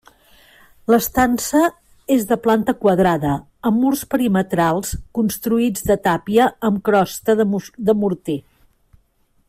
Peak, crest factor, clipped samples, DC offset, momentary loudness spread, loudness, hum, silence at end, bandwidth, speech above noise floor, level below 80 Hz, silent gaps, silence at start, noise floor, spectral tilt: -4 dBFS; 14 dB; under 0.1%; under 0.1%; 7 LU; -18 LUFS; none; 1.1 s; 16 kHz; 43 dB; -44 dBFS; none; 0.9 s; -60 dBFS; -5.5 dB/octave